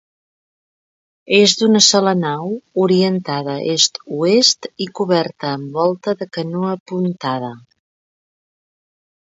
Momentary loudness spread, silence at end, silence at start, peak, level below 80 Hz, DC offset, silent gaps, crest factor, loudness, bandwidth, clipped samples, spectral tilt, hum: 12 LU; 1.7 s; 1.3 s; 0 dBFS; -66 dBFS; under 0.1%; 6.80-6.86 s; 18 dB; -16 LUFS; 8 kHz; under 0.1%; -3.5 dB/octave; none